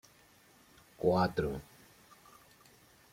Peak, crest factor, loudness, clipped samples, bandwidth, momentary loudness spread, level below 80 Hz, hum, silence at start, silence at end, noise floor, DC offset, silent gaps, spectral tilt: -16 dBFS; 20 dB; -33 LUFS; under 0.1%; 16.5 kHz; 17 LU; -60 dBFS; none; 1 s; 1.5 s; -63 dBFS; under 0.1%; none; -7 dB/octave